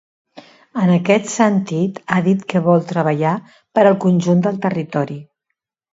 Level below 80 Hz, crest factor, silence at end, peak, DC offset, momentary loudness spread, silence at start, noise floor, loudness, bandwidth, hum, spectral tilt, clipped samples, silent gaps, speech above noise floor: -62 dBFS; 16 dB; 0.7 s; 0 dBFS; under 0.1%; 8 LU; 0.35 s; -77 dBFS; -17 LUFS; 8 kHz; none; -7 dB/octave; under 0.1%; none; 61 dB